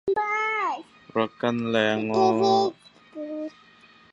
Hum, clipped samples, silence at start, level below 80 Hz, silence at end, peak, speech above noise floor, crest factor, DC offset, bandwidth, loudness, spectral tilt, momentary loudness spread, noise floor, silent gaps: none; under 0.1%; 0.05 s; -68 dBFS; 0.65 s; -6 dBFS; 31 dB; 20 dB; under 0.1%; 8 kHz; -24 LUFS; -5.5 dB/octave; 15 LU; -54 dBFS; none